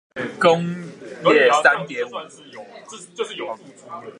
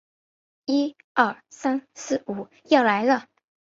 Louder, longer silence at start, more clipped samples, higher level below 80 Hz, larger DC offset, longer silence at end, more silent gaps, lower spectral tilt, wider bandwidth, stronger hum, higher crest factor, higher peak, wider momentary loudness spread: first, -19 LUFS vs -24 LUFS; second, 0.15 s vs 0.7 s; neither; about the same, -72 dBFS vs -72 dBFS; neither; second, 0.1 s vs 0.45 s; second, none vs 1.04-1.15 s; about the same, -4.5 dB/octave vs -4 dB/octave; first, 11.5 kHz vs 7.8 kHz; neither; about the same, 20 dB vs 22 dB; first, 0 dBFS vs -4 dBFS; first, 24 LU vs 11 LU